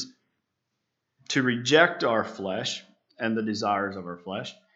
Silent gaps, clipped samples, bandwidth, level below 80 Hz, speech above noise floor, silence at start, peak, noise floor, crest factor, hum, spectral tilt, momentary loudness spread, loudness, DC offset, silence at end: none; under 0.1%; 8.2 kHz; -80 dBFS; 55 dB; 0 s; -2 dBFS; -81 dBFS; 26 dB; none; -4 dB/octave; 16 LU; -26 LUFS; under 0.1%; 0.2 s